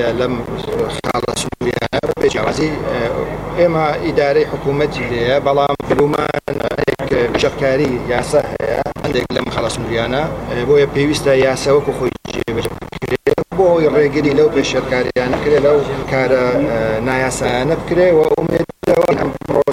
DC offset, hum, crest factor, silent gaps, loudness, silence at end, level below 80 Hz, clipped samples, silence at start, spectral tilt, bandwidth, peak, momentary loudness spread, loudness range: under 0.1%; none; 14 dB; none; -16 LUFS; 0 s; -36 dBFS; under 0.1%; 0 s; -5.5 dB/octave; 16 kHz; 0 dBFS; 7 LU; 3 LU